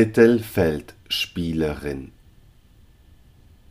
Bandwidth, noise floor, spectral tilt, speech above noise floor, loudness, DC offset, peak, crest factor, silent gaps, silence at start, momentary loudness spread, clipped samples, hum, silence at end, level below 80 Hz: 15.5 kHz; -52 dBFS; -6 dB/octave; 32 dB; -22 LUFS; under 0.1%; -2 dBFS; 20 dB; none; 0 s; 16 LU; under 0.1%; none; 1.65 s; -44 dBFS